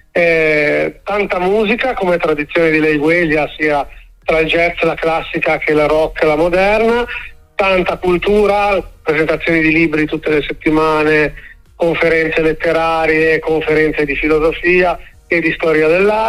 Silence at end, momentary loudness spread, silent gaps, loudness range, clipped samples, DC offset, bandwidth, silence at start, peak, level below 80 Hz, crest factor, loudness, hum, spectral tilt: 0 s; 5 LU; none; 1 LU; under 0.1%; under 0.1%; 14 kHz; 0.15 s; 0 dBFS; -34 dBFS; 12 dB; -13 LUFS; none; -6 dB/octave